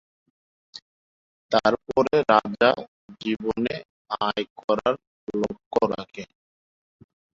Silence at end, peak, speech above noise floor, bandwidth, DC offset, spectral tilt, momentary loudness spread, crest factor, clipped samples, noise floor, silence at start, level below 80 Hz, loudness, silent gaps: 1.1 s; -4 dBFS; over 66 dB; 7.8 kHz; under 0.1%; -5.5 dB/octave; 22 LU; 22 dB; under 0.1%; under -90 dBFS; 0.75 s; -60 dBFS; -24 LUFS; 0.82-1.49 s, 2.88-3.08 s, 3.85-4.05 s, 4.50-4.56 s, 4.64-4.68 s, 5.07-5.27 s, 5.66-5.71 s